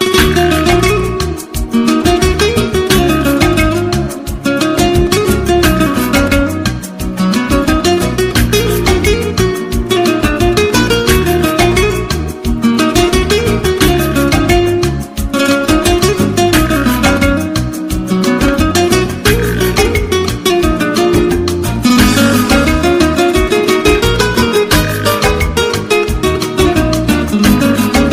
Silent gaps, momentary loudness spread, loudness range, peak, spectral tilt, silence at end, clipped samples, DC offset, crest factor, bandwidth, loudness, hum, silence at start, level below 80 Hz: none; 5 LU; 2 LU; 0 dBFS; -5 dB/octave; 0 s; under 0.1%; under 0.1%; 10 dB; 16 kHz; -11 LUFS; none; 0 s; -20 dBFS